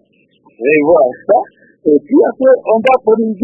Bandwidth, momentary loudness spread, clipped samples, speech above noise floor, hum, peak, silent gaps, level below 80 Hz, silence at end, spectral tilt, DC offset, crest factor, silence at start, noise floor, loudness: 3.9 kHz; 6 LU; under 0.1%; 40 dB; none; 0 dBFS; none; -58 dBFS; 0 s; -8 dB/octave; under 0.1%; 12 dB; 0.6 s; -51 dBFS; -12 LUFS